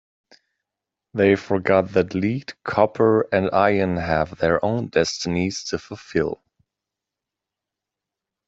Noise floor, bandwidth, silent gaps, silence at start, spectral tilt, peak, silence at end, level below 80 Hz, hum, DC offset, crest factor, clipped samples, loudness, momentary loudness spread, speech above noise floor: -86 dBFS; 8 kHz; none; 1.15 s; -5.5 dB/octave; -2 dBFS; 2.15 s; -52 dBFS; none; under 0.1%; 20 dB; under 0.1%; -21 LUFS; 10 LU; 65 dB